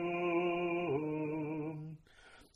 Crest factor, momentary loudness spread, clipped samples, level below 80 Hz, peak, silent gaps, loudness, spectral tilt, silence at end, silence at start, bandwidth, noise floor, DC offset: 14 dB; 14 LU; under 0.1%; -70 dBFS; -24 dBFS; none; -36 LUFS; -8 dB/octave; 0.1 s; 0 s; 6.4 kHz; -60 dBFS; under 0.1%